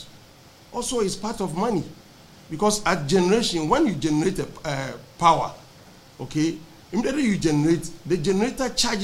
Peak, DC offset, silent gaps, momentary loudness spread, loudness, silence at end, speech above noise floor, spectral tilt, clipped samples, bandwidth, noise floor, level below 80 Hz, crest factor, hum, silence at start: -4 dBFS; under 0.1%; none; 11 LU; -23 LUFS; 0 s; 27 dB; -4.5 dB/octave; under 0.1%; 16 kHz; -49 dBFS; -46 dBFS; 20 dB; none; 0 s